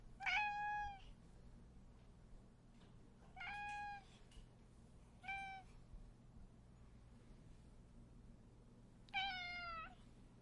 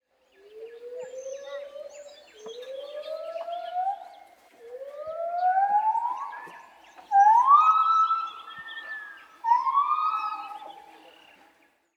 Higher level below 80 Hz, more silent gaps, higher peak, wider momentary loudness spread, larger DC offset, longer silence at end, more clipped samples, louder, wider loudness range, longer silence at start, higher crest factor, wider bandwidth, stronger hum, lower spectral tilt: first, -64 dBFS vs -82 dBFS; neither; second, -28 dBFS vs -8 dBFS; about the same, 23 LU vs 25 LU; neither; second, 0 s vs 1.15 s; neither; second, -46 LUFS vs -24 LUFS; second, 9 LU vs 14 LU; second, 0 s vs 0.55 s; about the same, 22 dB vs 20 dB; first, 11 kHz vs 9.2 kHz; neither; first, -3.5 dB/octave vs -1 dB/octave